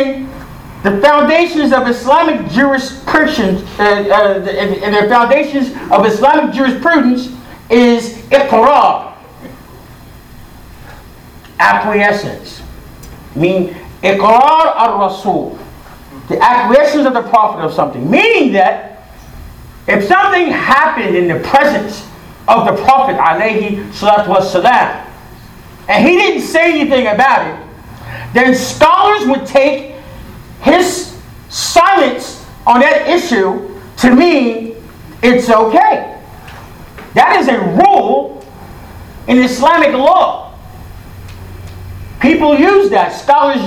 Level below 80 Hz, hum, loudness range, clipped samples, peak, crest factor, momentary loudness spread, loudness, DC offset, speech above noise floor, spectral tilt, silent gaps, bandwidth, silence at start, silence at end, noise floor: -40 dBFS; none; 3 LU; 0.4%; 0 dBFS; 12 dB; 18 LU; -10 LUFS; under 0.1%; 25 dB; -5 dB/octave; none; 19.5 kHz; 0 s; 0 s; -35 dBFS